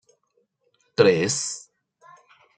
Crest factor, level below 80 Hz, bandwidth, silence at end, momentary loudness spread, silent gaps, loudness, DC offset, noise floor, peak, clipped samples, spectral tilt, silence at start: 22 dB; -68 dBFS; 9.4 kHz; 1 s; 15 LU; none; -22 LUFS; under 0.1%; -70 dBFS; -4 dBFS; under 0.1%; -3.5 dB/octave; 1 s